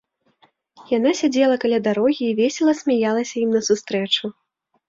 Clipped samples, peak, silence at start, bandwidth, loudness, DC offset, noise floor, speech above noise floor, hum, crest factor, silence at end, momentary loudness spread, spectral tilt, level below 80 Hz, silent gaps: under 0.1%; -6 dBFS; 0.8 s; 7.8 kHz; -20 LUFS; under 0.1%; -60 dBFS; 41 dB; none; 14 dB; 0.55 s; 4 LU; -4 dB/octave; -66 dBFS; none